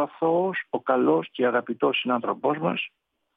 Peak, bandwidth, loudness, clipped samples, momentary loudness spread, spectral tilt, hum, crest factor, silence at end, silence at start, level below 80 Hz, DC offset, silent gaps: -8 dBFS; 3.9 kHz; -25 LUFS; under 0.1%; 6 LU; -9 dB/octave; none; 16 dB; 0.5 s; 0 s; -84 dBFS; under 0.1%; none